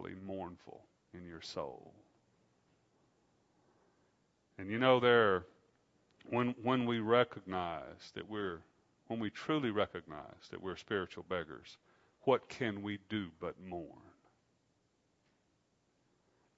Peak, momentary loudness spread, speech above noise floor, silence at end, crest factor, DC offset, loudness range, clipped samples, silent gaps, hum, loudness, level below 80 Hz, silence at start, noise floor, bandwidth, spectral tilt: -14 dBFS; 19 LU; 41 dB; 2.6 s; 24 dB; under 0.1%; 18 LU; under 0.1%; none; none; -36 LUFS; -74 dBFS; 0 s; -77 dBFS; 7.6 kHz; -4 dB/octave